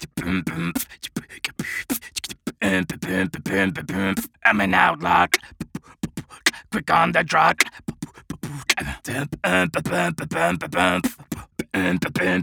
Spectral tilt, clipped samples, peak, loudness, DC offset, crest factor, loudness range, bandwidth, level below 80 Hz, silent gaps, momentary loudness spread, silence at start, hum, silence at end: -4 dB/octave; under 0.1%; -2 dBFS; -22 LUFS; under 0.1%; 22 dB; 5 LU; over 20 kHz; -48 dBFS; none; 15 LU; 0 s; none; 0 s